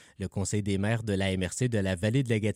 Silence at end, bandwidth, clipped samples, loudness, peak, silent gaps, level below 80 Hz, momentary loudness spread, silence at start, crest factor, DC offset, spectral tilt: 0 s; 15.5 kHz; under 0.1%; -29 LUFS; -14 dBFS; none; -56 dBFS; 4 LU; 0.2 s; 16 dB; under 0.1%; -5.5 dB/octave